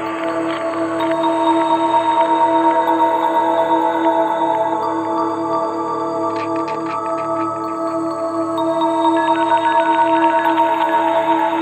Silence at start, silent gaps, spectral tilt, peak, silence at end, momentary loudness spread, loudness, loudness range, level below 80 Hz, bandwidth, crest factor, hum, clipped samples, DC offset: 0 s; none; -5.5 dB/octave; -2 dBFS; 0 s; 7 LU; -17 LUFS; 5 LU; -64 dBFS; 13 kHz; 14 dB; none; under 0.1%; under 0.1%